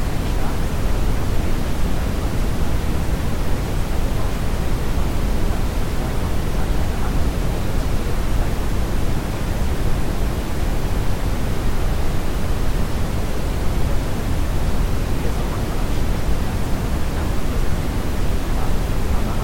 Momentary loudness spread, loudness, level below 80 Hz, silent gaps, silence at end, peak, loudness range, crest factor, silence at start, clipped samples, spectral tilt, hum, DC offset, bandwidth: 1 LU; -24 LUFS; -22 dBFS; none; 0 s; -6 dBFS; 0 LU; 10 dB; 0 s; under 0.1%; -6 dB/octave; none; under 0.1%; 16.5 kHz